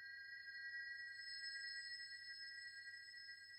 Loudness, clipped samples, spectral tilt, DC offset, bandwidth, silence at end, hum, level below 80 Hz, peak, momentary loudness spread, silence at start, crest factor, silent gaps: -51 LUFS; under 0.1%; 2.5 dB/octave; under 0.1%; 15.5 kHz; 0 s; none; under -90 dBFS; -40 dBFS; 6 LU; 0 s; 14 dB; none